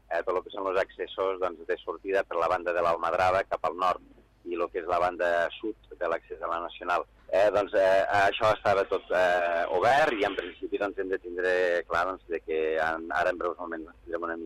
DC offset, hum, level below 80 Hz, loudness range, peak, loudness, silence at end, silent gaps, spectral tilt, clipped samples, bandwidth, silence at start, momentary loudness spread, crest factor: under 0.1%; none; -58 dBFS; 5 LU; -12 dBFS; -28 LUFS; 0 s; none; -4.5 dB/octave; under 0.1%; 13 kHz; 0.1 s; 11 LU; 14 dB